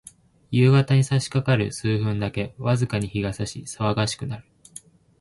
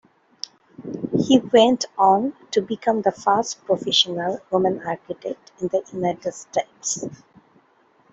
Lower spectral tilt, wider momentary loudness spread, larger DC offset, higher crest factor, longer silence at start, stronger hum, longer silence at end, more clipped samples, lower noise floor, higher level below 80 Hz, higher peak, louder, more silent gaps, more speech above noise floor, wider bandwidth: first, -6 dB/octave vs -4 dB/octave; about the same, 18 LU vs 16 LU; neither; about the same, 16 dB vs 20 dB; second, 0.5 s vs 0.8 s; neither; second, 0.8 s vs 1 s; neither; second, -47 dBFS vs -59 dBFS; first, -50 dBFS vs -64 dBFS; second, -6 dBFS vs -2 dBFS; about the same, -23 LUFS vs -21 LUFS; neither; second, 25 dB vs 38 dB; first, 11.5 kHz vs 8.2 kHz